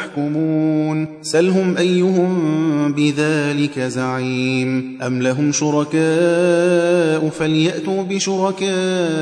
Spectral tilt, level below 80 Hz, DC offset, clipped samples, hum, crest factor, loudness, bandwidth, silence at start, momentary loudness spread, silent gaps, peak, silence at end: -5.5 dB/octave; -62 dBFS; under 0.1%; under 0.1%; none; 14 dB; -17 LUFS; 11 kHz; 0 s; 6 LU; none; -4 dBFS; 0 s